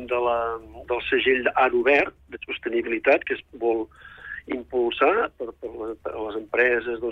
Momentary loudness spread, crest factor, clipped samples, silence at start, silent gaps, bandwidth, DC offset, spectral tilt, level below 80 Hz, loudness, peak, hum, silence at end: 14 LU; 16 dB; under 0.1%; 0 s; none; 6.2 kHz; under 0.1%; -6 dB/octave; -54 dBFS; -23 LUFS; -8 dBFS; none; 0 s